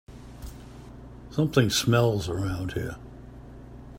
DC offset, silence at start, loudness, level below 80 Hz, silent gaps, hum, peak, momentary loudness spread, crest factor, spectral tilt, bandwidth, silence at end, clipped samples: under 0.1%; 0.1 s; -26 LUFS; -46 dBFS; none; none; -4 dBFS; 24 LU; 24 dB; -5 dB/octave; 16 kHz; 0 s; under 0.1%